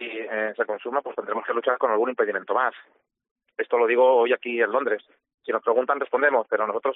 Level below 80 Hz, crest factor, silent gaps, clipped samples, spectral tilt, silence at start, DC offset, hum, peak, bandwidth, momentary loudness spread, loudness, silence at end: -78 dBFS; 18 dB; 3.31-3.36 s, 5.34-5.38 s; under 0.1%; -1 dB/octave; 0 s; under 0.1%; none; -6 dBFS; 3.9 kHz; 11 LU; -24 LUFS; 0 s